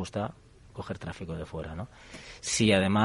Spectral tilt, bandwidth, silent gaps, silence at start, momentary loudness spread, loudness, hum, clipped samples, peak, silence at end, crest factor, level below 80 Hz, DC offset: -4.5 dB/octave; 11.5 kHz; none; 0 s; 21 LU; -30 LUFS; none; under 0.1%; -8 dBFS; 0 s; 22 dB; -52 dBFS; under 0.1%